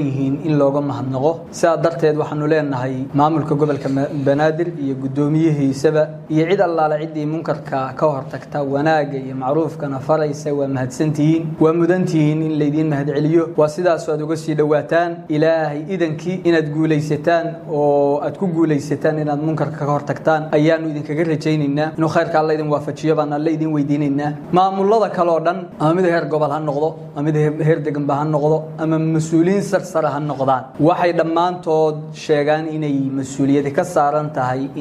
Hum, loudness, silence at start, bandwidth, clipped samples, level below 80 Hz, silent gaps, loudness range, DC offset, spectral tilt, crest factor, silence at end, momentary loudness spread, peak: none; -18 LUFS; 0 s; 11.5 kHz; under 0.1%; -58 dBFS; none; 1 LU; under 0.1%; -7.5 dB/octave; 16 dB; 0 s; 6 LU; -2 dBFS